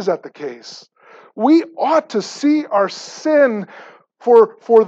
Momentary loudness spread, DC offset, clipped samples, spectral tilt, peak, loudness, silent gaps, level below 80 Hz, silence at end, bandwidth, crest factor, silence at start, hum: 18 LU; under 0.1%; under 0.1%; -5 dB/octave; -2 dBFS; -16 LUFS; none; -70 dBFS; 0 s; 7.8 kHz; 16 dB; 0 s; none